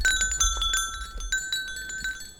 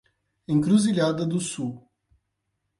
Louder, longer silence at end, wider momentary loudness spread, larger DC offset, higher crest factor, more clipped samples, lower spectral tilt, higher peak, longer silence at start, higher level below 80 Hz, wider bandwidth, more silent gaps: about the same, -26 LUFS vs -24 LUFS; second, 0 s vs 1 s; second, 10 LU vs 13 LU; neither; about the same, 18 dB vs 18 dB; neither; second, 1 dB/octave vs -6 dB/octave; about the same, -10 dBFS vs -8 dBFS; second, 0 s vs 0.5 s; first, -36 dBFS vs -62 dBFS; first, over 20 kHz vs 11.5 kHz; neither